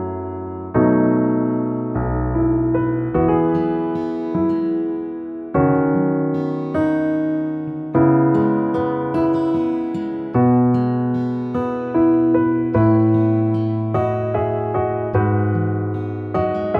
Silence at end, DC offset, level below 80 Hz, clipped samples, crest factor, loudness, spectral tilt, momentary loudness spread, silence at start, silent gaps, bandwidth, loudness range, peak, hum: 0 s; under 0.1%; -40 dBFS; under 0.1%; 14 dB; -19 LUFS; -11 dB/octave; 8 LU; 0 s; none; 4.5 kHz; 2 LU; -4 dBFS; none